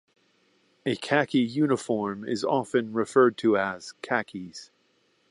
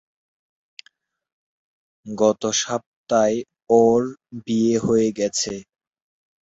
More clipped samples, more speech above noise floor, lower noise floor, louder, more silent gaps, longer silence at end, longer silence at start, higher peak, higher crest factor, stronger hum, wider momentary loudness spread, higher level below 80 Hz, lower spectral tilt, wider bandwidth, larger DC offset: neither; about the same, 42 dB vs 41 dB; first, -68 dBFS vs -61 dBFS; second, -26 LUFS vs -21 LUFS; second, none vs 2.86-3.04 s; second, 0.65 s vs 0.85 s; second, 0.85 s vs 2.05 s; second, -6 dBFS vs -2 dBFS; about the same, 20 dB vs 20 dB; neither; first, 16 LU vs 13 LU; second, -70 dBFS vs -58 dBFS; about the same, -5.5 dB/octave vs -4.5 dB/octave; first, 11.5 kHz vs 8 kHz; neither